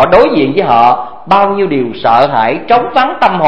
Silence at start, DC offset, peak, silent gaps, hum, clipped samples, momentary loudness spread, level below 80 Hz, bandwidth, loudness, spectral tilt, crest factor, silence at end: 0 s; 3%; 0 dBFS; none; none; 0.8%; 5 LU; -40 dBFS; 8 kHz; -10 LUFS; -7 dB/octave; 10 dB; 0 s